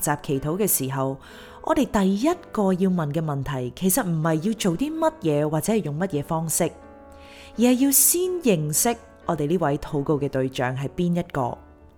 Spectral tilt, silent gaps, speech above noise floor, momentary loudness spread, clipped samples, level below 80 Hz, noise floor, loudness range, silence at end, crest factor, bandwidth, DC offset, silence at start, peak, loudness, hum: -5 dB/octave; none; 22 dB; 8 LU; under 0.1%; -48 dBFS; -45 dBFS; 3 LU; 0.3 s; 18 dB; over 20 kHz; under 0.1%; 0 s; -6 dBFS; -23 LUFS; none